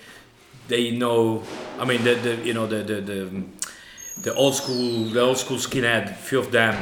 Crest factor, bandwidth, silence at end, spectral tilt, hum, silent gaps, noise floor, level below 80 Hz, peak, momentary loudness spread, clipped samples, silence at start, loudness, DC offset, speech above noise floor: 20 dB; 19.5 kHz; 0 s; -4 dB/octave; none; none; -48 dBFS; -58 dBFS; -4 dBFS; 12 LU; under 0.1%; 0 s; -23 LUFS; under 0.1%; 26 dB